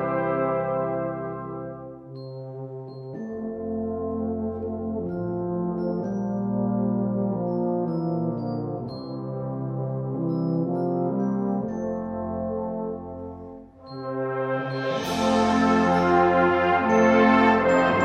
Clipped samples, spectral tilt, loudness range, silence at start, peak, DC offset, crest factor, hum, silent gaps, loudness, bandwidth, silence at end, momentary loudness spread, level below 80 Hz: under 0.1%; -7 dB/octave; 10 LU; 0 s; -6 dBFS; under 0.1%; 18 dB; none; none; -25 LUFS; 12.5 kHz; 0 s; 17 LU; -54 dBFS